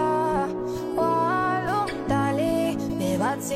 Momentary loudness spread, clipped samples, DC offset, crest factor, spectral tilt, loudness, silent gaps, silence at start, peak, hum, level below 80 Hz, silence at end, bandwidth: 4 LU; under 0.1%; under 0.1%; 12 dB; -6 dB/octave; -25 LUFS; none; 0 s; -12 dBFS; none; -48 dBFS; 0 s; 16 kHz